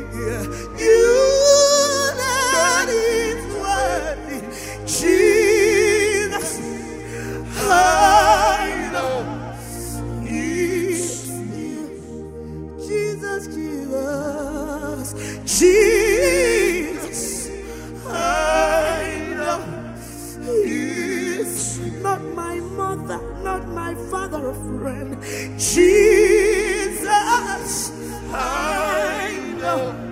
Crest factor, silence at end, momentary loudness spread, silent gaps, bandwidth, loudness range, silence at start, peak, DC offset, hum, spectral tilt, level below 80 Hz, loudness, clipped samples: 18 dB; 0 s; 16 LU; none; 16 kHz; 10 LU; 0 s; 0 dBFS; under 0.1%; none; -3.5 dB/octave; -38 dBFS; -19 LUFS; under 0.1%